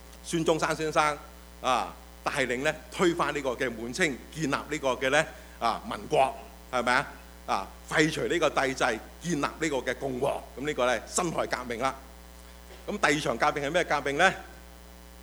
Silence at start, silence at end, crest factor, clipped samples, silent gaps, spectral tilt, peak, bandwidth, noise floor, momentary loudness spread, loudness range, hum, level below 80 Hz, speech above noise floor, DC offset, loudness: 0 s; 0 s; 22 dB; under 0.1%; none; -3.5 dB/octave; -6 dBFS; over 20 kHz; -48 dBFS; 14 LU; 2 LU; none; -50 dBFS; 20 dB; under 0.1%; -28 LUFS